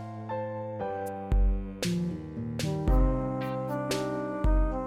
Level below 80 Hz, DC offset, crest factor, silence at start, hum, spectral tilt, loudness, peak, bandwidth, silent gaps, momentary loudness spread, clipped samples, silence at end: -30 dBFS; under 0.1%; 14 dB; 0 s; none; -6.5 dB/octave; -31 LUFS; -14 dBFS; 14 kHz; none; 8 LU; under 0.1%; 0 s